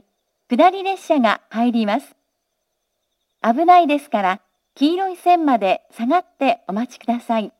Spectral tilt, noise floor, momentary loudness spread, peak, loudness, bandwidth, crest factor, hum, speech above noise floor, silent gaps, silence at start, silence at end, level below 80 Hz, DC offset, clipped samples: -5.5 dB/octave; -74 dBFS; 11 LU; -2 dBFS; -18 LUFS; 13 kHz; 18 dB; none; 57 dB; none; 0.5 s; 0.1 s; -78 dBFS; under 0.1%; under 0.1%